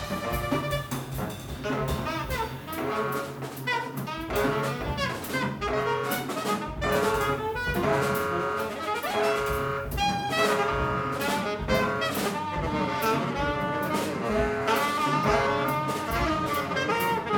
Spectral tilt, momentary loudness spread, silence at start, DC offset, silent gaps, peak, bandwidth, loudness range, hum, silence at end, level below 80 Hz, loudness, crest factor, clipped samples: -5 dB/octave; 6 LU; 0 s; under 0.1%; none; -10 dBFS; over 20 kHz; 4 LU; none; 0 s; -42 dBFS; -27 LUFS; 16 dB; under 0.1%